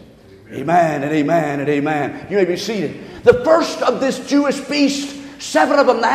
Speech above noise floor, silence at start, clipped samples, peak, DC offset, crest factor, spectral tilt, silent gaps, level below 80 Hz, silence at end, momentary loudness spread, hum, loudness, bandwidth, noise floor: 26 dB; 0.5 s; under 0.1%; 0 dBFS; under 0.1%; 16 dB; -5 dB/octave; none; -52 dBFS; 0 s; 10 LU; none; -17 LUFS; 14 kHz; -43 dBFS